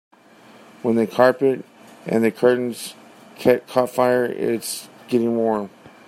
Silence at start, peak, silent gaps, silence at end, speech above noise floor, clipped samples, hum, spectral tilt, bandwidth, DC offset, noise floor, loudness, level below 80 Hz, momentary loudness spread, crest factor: 0.85 s; -2 dBFS; none; 0.2 s; 29 dB; under 0.1%; none; -5.5 dB/octave; 16 kHz; under 0.1%; -48 dBFS; -20 LUFS; -66 dBFS; 13 LU; 20 dB